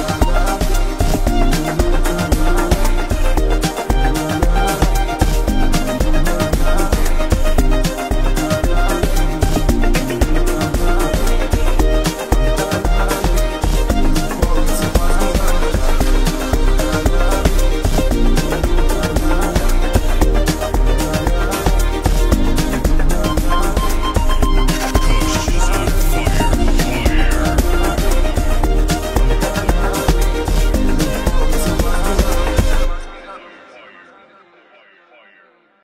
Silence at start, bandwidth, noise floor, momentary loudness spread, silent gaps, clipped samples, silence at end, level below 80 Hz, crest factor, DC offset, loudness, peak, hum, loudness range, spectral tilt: 0 s; 16 kHz; -51 dBFS; 2 LU; none; under 0.1%; 2 s; -16 dBFS; 12 dB; 0.4%; -18 LUFS; -2 dBFS; none; 1 LU; -5 dB/octave